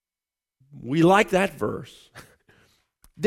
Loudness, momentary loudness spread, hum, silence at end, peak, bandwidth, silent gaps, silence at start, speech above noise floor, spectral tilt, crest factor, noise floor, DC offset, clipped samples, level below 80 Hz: -21 LUFS; 22 LU; none; 0 s; -4 dBFS; 15.5 kHz; none; 0.75 s; over 68 dB; -6 dB/octave; 20 dB; under -90 dBFS; under 0.1%; under 0.1%; -58 dBFS